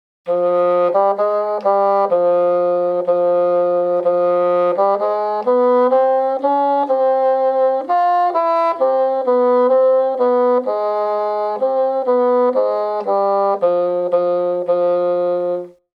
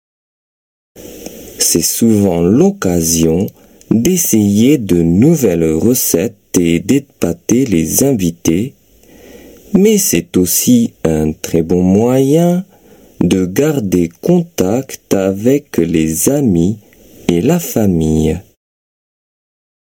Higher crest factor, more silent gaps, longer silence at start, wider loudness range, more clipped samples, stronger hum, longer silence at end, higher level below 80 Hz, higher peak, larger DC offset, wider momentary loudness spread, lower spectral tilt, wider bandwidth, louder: about the same, 12 dB vs 14 dB; neither; second, 0.25 s vs 0.95 s; about the same, 2 LU vs 3 LU; neither; neither; second, 0.25 s vs 1.45 s; second, -76 dBFS vs -38 dBFS; second, -4 dBFS vs 0 dBFS; neither; second, 5 LU vs 8 LU; first, -8 dB/octave vs -5.5 dB/octave; second, 5 kHz vs 18 kHz; second, -16 LUFS vs -12 LUFS